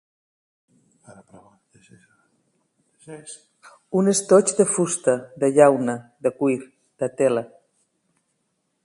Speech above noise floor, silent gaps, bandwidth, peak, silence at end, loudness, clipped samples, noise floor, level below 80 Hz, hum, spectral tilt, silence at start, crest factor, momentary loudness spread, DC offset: 52 dB; none; 11.5 kHz; 0 dBFS; 1.4 s; -20 LUFS; under 0.1%; -73 dBFS; -70 dBFS; none; -5 dB/octave; 3.1 s; 22 dB; 24 LU; under 0.1%